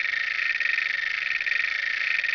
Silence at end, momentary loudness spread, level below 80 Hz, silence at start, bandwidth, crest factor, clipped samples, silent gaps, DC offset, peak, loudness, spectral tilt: 0 s; 2 LU; -70 dBFS; 0 s; 5.4 kHz; 14 dB; under 0.1%; none; under 0.1%; -12 dBFS; -24 LUFS; 1.5 dB/octave